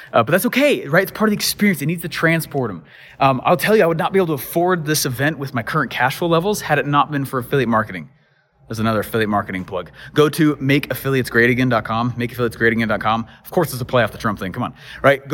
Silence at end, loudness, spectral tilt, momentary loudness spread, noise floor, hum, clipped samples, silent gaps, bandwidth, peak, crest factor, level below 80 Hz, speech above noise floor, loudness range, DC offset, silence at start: 0 s; -18 LUFS; -5 dB/octave; 9 LU; -56 dBFS; none; under 0.1%; none; 17 kHz; -2 dBFS; 16 dB; -48 dBFS; 38 dB; 3 LU; under 0.1%; 0 s